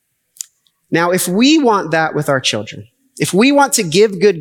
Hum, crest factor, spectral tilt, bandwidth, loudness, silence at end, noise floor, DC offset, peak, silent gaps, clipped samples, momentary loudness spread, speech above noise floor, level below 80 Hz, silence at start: none; 14 dB; -4 dB/octave; 19 kHz; -13 LUFS; 0 s; -52 dBFS; under 0.1%; -2 dBFS; none; under 0.1%; 20 LU; 39 dB; -68 dBFS; 0.9 s